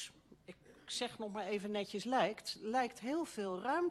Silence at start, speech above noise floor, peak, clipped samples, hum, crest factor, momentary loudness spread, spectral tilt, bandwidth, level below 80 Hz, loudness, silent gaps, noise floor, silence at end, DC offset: 0 s; 20 dB; -22 dBFS; under 0.1%; none; 18 dB; 19 LU; -4 dB/octave; 13 kHz; -76 dBFS; -39 LUFS; none; -59 dBFS; 0 s; under 0.1%